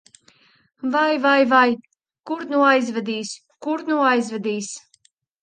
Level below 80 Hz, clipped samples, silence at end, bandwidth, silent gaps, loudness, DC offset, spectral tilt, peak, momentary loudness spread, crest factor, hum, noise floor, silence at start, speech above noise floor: -72 dBFS; under 0.1%; 0.65 s; 9.8 kHz; none; -20 LUFS; under 0.1%; -3.5 dB/octave; -4 dBFS; 15 LU; 18 dB; none; -61 dBFS; 0.85 s; 42 dB